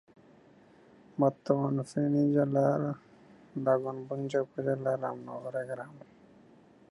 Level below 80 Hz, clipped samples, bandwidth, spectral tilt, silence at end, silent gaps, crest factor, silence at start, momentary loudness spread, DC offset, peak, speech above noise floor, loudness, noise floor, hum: -76 dBFS; under 0.1%; 11.5 kHz; -8.5 dB/octave; 0.9 s; none; 22 dB; 1.15 s; 14 LU; under 0.1%; -10 dBFS; 29 dB; -31 LUFS; -59 dBFS; none